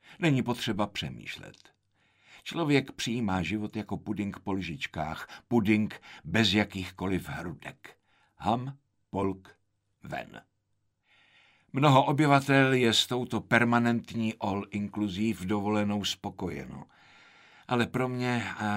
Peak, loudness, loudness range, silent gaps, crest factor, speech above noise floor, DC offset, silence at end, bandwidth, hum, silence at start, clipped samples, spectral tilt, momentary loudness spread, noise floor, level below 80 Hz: -8 dBFS; -29 LUFS; 12 LU; none; 22 dB; 47 dB; under 0.1%; 0 s; 16 kHz; none; 0.1 s; under 0.1%; -5.5 dB/octave; 17 LU; -76 dBFS; -60 dBFS